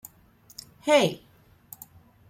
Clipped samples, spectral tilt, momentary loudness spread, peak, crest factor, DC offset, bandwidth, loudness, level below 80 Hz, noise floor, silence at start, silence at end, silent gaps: under 0.1%; -4 dB/octave; 26 LU; -6 dBFS; 24 dB; under 0.1%; 16.5 kHz; -24 LUFS; -66 dBFS; -57 dBFS; 0.85 s; 1.15 s; none